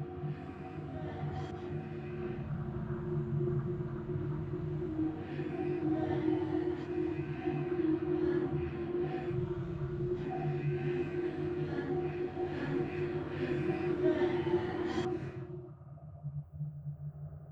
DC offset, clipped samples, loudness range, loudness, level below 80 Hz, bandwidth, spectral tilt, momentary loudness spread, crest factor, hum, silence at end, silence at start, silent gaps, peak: under 0.1%; under 0.1%; 4 LU; -36 LUFS; -56 dBFS; 7.4 kHz; -9 dB/octave; 11 LU; 16 dB; none; 0 s; 0 s; none; -18 dBFS